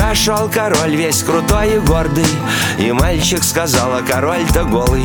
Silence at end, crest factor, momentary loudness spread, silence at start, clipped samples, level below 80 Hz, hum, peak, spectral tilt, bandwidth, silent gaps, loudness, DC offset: 0 s; 14 dB; 2 LU; 0 s; under 0.1%; -22 dBFS; none; 0 dBFS; -4 dB/octave; over 20 kHz; none; -14 LUFS; under 0.1%